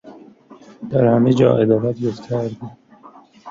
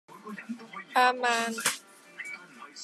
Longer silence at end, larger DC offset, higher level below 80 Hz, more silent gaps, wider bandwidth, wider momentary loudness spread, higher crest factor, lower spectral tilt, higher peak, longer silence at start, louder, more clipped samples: about the same, 0 s vs 0 s; neither; first, -56 dBFS vs under -90 dBFS; neither; second, 7.6 kHz vs 14 kHz; about the same, 20 LU vs 19 LU; about the same, 18 dB vs 22 dB; first, -9 dB/octave vs -1 dB/octave; first, -2 dBFS vs -10 dBFS; about the same, 0.05 s vs 0.1 s; first, -17 LUFS vs -27 LUFS; neither